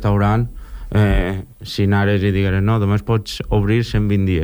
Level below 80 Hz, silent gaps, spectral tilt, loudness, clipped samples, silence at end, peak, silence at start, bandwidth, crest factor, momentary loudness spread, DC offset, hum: -28 dBFS; none; -7.5 dB/octave; -18 LUFS; under 0.1%; 0 s; -4 dBFS; 0 s; over 20 kHz; 14 dB; 8 LU; under 0.1%; none